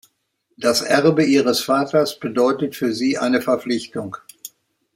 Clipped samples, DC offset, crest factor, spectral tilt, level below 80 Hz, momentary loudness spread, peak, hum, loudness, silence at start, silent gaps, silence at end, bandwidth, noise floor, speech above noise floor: under 0.1%; under 0.1%; 18 dB; -4.5 dB/octave; -64 dBFS; 17 LU; -2 dBFS; none; -19 LUFS; 0.6 s; none; 0.5 s; 16.5 kHz; -69 dBFS; 51 dB